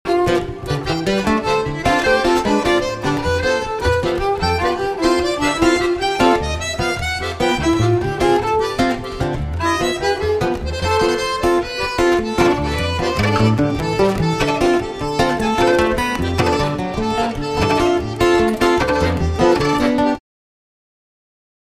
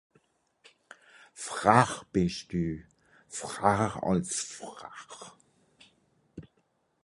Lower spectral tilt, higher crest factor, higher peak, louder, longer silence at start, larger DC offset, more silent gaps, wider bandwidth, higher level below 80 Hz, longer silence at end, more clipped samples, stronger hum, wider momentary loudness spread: about the same, -5.5 dB/octave vs -5 dB/octave; second, 16 dB vs 28 dB; first, 0 dBFS vs -4 dBFS; first, -17 LUFS vs -29 LUFS; second, 0.05 s vs 1.35 s; neither; neither; first, 15 kHz vs 11.5 kHz; first, -32 dBFS vs -56 dBFS; first, 1.55 s vs 0.65 s; neither; neither; second, 5 LU vs 26 LU